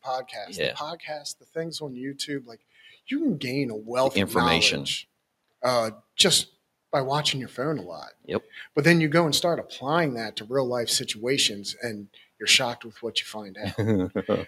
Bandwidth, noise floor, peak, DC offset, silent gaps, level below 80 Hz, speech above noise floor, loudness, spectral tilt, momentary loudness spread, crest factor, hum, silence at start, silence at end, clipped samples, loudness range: 15.5 kHz; -73 dBFS; -2 dBFS; under 0.1%; none; -62 dBFS; 47 dB; -25 LUFS; -3.5 dB/octave; 15 LU; 24 dB; none; 0.05 s; 0 s; under 0.1%; 6 LU